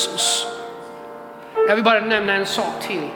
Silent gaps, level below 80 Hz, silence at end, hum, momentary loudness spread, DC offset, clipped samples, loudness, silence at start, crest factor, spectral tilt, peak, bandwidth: none; -62 dBFS; 0 s; none; 20 LU; under 0.1%; under 0.1%; -19 LUFS; 0 s; 20 dB; -2 dB/octave; -2 dBFS; 18 kHz